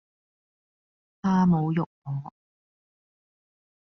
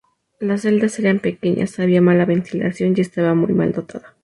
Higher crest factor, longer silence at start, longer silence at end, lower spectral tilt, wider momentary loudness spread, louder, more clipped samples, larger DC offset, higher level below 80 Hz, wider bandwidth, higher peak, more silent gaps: about the same, 16 dB vs 14 dB; first, 1.25 s vs 0.4 s; first, 1.7 s vs 0.15 s; about the same, -8.5 dB/octave vs -7.5 dB/octave; first, 13 LU vs 9 LU; second, -26 LUFS vs -18 LUFS; neither; neither; second, -62 dBFS vs -56 dBFS; second, 6.2 kHz vs 11.5 kHz; second, -12 dBFS vs -4 dBFS; first, 1.86-2.02 s vs none